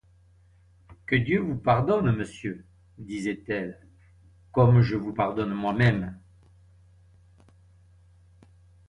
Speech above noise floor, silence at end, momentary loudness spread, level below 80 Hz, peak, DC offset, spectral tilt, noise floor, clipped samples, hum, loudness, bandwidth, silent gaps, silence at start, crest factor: 34 dB; 2.7 s; 17 LU; -52 dBFS; -8 dBFS; under 0.1%; -8 dB/octave; -58 dBFS; under 0.1%; none; -25 LUFS; 9.6 kHz; none; 0.9 s; 18 dB